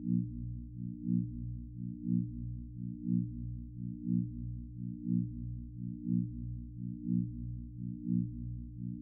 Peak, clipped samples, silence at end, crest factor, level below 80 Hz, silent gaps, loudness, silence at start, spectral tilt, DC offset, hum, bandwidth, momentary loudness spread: -20 dBFS; under 0.1%; 0 s; 16 dB; -50 dBFS; none; -39 LUFS; 0 s; -17.5 dB/octave; under 0.1%; 60 Hz at -40 dBFS; 0.4 kHz; 8 LU